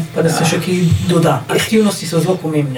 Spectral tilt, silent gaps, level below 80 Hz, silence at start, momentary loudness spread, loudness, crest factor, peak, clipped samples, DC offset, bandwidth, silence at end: -5.5 dB/octave; none; -44 dBFS; 0 s; 3 LU; -14 LUFS; 12 dB; -2 dBFS; under 0.1%; under 0.1%; 19 kHz; 0 s